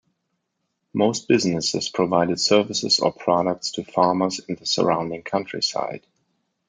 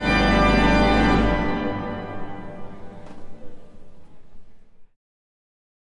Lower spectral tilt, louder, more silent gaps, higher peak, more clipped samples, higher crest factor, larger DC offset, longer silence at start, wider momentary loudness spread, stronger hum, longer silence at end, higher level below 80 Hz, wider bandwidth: second, -4 dB/octave vs -6 dB/octave; about the same, -22 LUFS vs -20 LUFS; neither; first, -2 dBFS vs -6 dBFS; neither; about the same, 20 dB vs 16 dB; neither; first, 0.95 s vs 0 s; second, 8 LU vs 24 LU; neither; second, 0.7 s vs 1.1 s; second, -64 dBFS vs -30 dBFS; about the same, 9.6 kHz vs 10.5 kHz